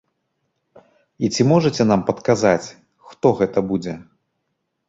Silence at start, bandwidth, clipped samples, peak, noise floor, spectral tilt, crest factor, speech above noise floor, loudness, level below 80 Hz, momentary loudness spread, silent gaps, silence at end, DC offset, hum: 1.2 s; 8 kHz; under 0.1%; -2 dBFS; -74 dBFS; -6 dB/octave; 20 dB; 56 dB; -19 LUFS; -54 dBFS; 11 LU; none; 0.85 s; under 0.1%; none